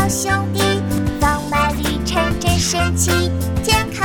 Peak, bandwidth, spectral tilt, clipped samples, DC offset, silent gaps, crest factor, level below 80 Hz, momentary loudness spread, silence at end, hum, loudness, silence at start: 0 dBFS; over 20 kHz; -4 dB/octave; under 0.1%; under 0.1%; none; 16 dB; -28 dBFS; 3 LU; 0 s; none; -17 LUFS; 0 s